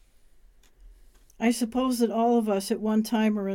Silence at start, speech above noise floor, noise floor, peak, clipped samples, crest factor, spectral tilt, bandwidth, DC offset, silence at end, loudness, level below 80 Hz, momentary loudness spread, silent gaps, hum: 0.85 s; 31 dB; -55 dBFS; -12 dBFS; under 0.1%; 16 dB; -5.5 dB/octave; 16.5 kHz; under 0.1%; 0 s; -25 LUFS; -56 dBFS; 4 LU; none; none